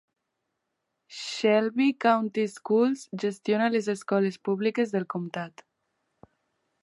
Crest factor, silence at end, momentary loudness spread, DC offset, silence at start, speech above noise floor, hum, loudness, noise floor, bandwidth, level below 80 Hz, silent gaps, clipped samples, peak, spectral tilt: 20 dB; 1.35 s; 12 LU; under 0.1%; 1.1 s; 55 dB; none; -26 LUFS; -81 dBFS; 11.5 kHz; -80 dBFS; none; under 0.1%; -8 dBFS; -5.5 dB/octave